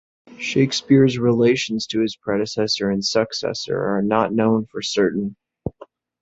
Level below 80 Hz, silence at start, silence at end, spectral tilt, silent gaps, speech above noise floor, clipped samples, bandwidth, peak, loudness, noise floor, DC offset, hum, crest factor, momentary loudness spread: -54 dBFS; 0.3 s; 0.4 s; -5 dB/octave; none; 28 dB; under 0.1%; 8 kHz; -2 dBFS; -20 LUFS; -47 dBFS; under 0.1%; none; 18 dB; 12 LU